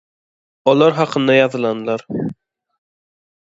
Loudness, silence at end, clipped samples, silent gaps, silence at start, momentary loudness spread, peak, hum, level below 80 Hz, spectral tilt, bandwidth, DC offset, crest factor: -16 LUFS; 1.25 s; under 0.1%; none; 0.65 s; 11 LU; 0 dBFS; none; -62 dBFS; -6.5 dB/octave; 7.8 kHz; under 0.1%; 18 dB